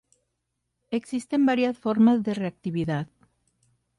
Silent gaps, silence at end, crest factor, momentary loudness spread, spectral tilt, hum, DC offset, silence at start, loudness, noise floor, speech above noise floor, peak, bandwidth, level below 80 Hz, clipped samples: none; 0.95 s; 16 dB; 12 LU; -7 dB/octave; none; under 0.1%; 0.9 s; -25 LUFS; -79 dBFS; 56 dB; -10 dBFS; 11.5 kHz; -64 dBFS; under 0.1%